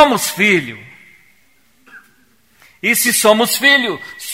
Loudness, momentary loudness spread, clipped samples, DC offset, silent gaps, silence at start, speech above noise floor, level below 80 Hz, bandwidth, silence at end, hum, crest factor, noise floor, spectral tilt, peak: -13 LUFS; 15 LU; under 0.1%; 0.2%; none; 0 s; 42 dB; -58 dBFS; 16.5 kHz; 0 s; none; 16 dB; -56 dBFS; -2 dB/octave; 0 dBFS